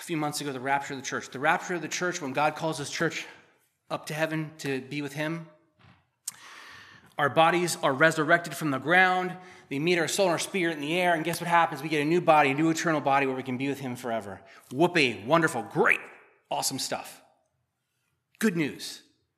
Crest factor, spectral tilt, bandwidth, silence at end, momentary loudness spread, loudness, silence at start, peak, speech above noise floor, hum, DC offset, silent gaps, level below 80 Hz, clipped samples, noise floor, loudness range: 22 dB; -4 dB/octave; 15 kHz; 0.4 s; 17 LU; -26 LUFS; 0 s; -6 dBFS; 51 dB; none; under 0.1%; none; -80 dBFS; under 0.1%; -78 dBFS; 8 LU